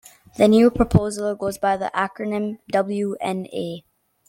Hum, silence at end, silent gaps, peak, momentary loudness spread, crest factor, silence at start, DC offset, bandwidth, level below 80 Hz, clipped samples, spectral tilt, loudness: none; 0.5 s; none; -2 dBFS; 14 LU; 18 dB; 0.4 s; under 0.1%; 16 kHz; -42 dBFS; under 0.1%; -6.5 dB/octave; -21 LUFS